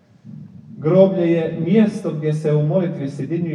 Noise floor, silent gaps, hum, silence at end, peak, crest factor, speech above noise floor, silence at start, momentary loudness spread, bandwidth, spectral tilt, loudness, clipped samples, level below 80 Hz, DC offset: -39 dBFS; none; none; 0 s; -2 dBFS; 18 dB; 22 dB; 0.25 s; 11 LU; 10.5 kHz; -9 dB/octave; -18 LUFS; under 0.1%; -66 dBFS; under 0.1%